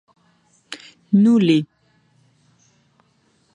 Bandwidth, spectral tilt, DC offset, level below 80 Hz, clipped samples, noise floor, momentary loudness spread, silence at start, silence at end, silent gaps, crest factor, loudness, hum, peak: 10.5 kHz; -7.5 dB/octave; under 0.1%; -70 dBFS; under 0.1%; -62 dBFS; 23 LU; 0.7 s; 1.9 s; none; 18 dB; -16 LUFS; none; -4 dBFS